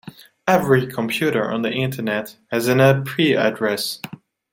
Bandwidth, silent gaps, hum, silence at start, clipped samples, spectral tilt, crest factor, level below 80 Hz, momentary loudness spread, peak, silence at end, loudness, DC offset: 17 kHz; none; none; 0.05 s; under 0.1%; -5.5 dB/octave; 18 dB; -60 dBFS; 11 LU; -2 dBFS; 0.4 s; -19 LUFS; under 0.1%